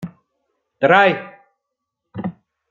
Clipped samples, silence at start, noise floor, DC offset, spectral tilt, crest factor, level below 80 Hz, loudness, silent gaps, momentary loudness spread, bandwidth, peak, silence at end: under 0.1%; 0 s; -79 dBFS; under 0.1%; -6.5 dB/octave; 20 dB; -66 dBFS; -15 LUFS; none; 22 LU; 7.2 kHz; -2 dBFS; 0.4 s